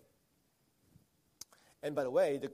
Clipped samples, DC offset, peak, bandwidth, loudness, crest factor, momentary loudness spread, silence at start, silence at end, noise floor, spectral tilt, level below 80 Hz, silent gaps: under 0.1%; under 0.1%; -20 dBFS; 15 kHz; -35 LUFS; 20 dB; 22 LU; 1.85 s; 0 s; -75 dBFS; -5 dB/octave; -82 dBFS; none